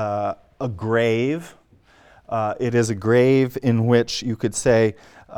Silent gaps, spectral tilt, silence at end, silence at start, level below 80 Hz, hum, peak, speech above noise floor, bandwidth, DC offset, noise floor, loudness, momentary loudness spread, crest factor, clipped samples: none; -6 dB/octave; 0 s; 0 s; -52 dBFS; none; -4 dBFS; 33 dB; 16 kHz; under 0.1%; -53 dBFS; -21 LUFS; 11 LU; 18 dB; under 0.1%